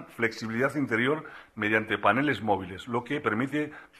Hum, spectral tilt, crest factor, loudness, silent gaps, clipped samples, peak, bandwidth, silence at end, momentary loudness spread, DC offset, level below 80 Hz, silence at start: none; -6 dB/octave; 20 dB; -28 LUFS; none; under 0.1%; -8 dBFS; 14 kHz; 0.15 s; 8 LU; under 0.1%; -64 dBFS; 0 s